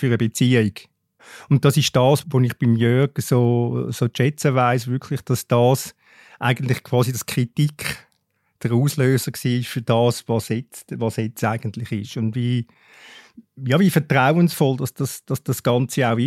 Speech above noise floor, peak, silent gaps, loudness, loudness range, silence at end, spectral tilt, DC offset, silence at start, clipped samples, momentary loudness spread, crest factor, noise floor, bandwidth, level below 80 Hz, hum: 49 dB; -2 dBFS; none; -20 LUFS; 4 LU; 0 s; -6 dB/octave; under 0.1%; 0 s; under 0.1%; 10 LU; 18 dB; -68 dBFS; 16 kHz; -60 dBFS; none